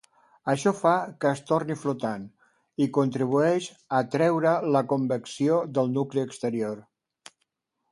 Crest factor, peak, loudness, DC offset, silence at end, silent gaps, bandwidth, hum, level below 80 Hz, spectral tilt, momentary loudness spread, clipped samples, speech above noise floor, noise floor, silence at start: 18 dB; -8 dBFS; -26 LUFS; under 0.1%; 1.1 s; none; 11.5 kHz; none; -72 dBFS; -6.5 dB/octave; 9 LU; under 0.1%; 53 dB; -78 dBFS; 0.45 s